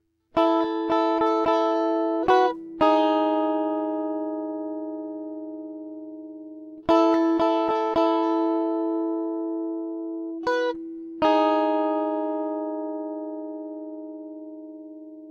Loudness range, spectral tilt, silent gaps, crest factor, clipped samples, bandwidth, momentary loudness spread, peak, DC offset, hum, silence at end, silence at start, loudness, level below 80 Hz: 7 LU; -5.5 dB/octave; none; 18 dB; under 0.1%; 7 kHz; 18 LU; -6 dBFS; under 0.1%; none; 0 s; 0.35 s; -24 LUFS; -62 dBFS